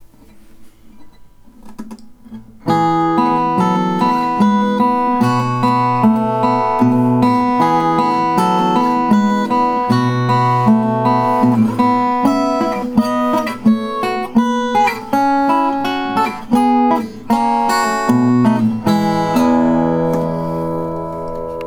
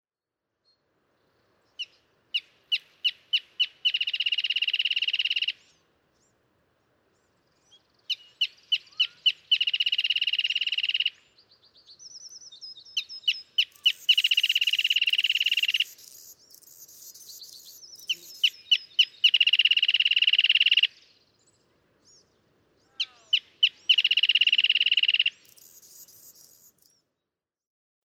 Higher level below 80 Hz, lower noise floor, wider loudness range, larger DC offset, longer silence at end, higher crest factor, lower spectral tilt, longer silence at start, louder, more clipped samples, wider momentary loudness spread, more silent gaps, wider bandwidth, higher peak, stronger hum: first, -46 dBFS vs -86 dBFS; second, -41 dBFS vs -88 dBFS; second, 2 LU vs 9 LU; neither; second, 0 s vs 2 s; about the same, 14 dB vs 18 dB; first, -7 dB/octave vs 4 dB/octave; second, 0 s vs 1.8 s; first, -15 LUFS vs -23 LUFS; neither; second, 6 LU vs 20 LU; neither; about the same, 16.5 kHz vs 17 kHz; first, 0 dBFS vs -10 dBFS; neither